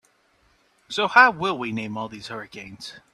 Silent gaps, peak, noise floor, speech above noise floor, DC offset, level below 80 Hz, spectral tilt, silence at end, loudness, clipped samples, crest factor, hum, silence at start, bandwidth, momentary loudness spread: none; 0 dBFS; -63 dBFS; 40 dB; under 0.1%; -64 dBFS; -4 dB/octave; 0.15 s; -21 LUFS; under 0.1%; 24 dB; none; 0.9 s; 13 kHz; 22 LU